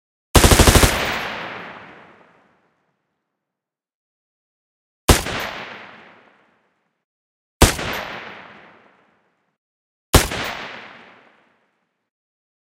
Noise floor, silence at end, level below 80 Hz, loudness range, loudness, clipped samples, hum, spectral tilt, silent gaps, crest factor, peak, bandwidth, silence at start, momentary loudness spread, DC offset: -86 dBFS; 1.75 s; -28 dBFS; 6 LU; -17 LUFS; under 0.1%; none; -3.5 dB/octave; 3.94-5.08 s, 7.04-7.60 s, 9.58-10.13 s; 22 dB; 0 dBFS; 16 kHz; 0.35 s; 25 LU; under 0.1%